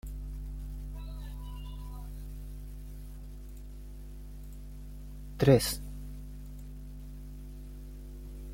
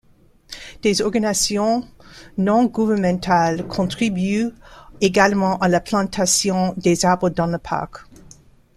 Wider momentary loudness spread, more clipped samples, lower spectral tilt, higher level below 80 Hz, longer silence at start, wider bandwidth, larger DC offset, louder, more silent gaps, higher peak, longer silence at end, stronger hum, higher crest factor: first, 18 LU vs 9 LU; neither; first, -6 dB/octave vs -4.5 dB/octave; about the same, -42 dBFS vs -46 dBFS; second, 0.05 s vs 0.5 s; first, 16.5 kHz vs 14.5 kHz; neither; second, -34 LUFS vs -19 LUFS; neither; second, -10 dBFS vs -2 dBFS; second, 0 s vs 0.75 s; first, 50 Hz at -45 dBFS vs none; first, 26 dB vs 18 dB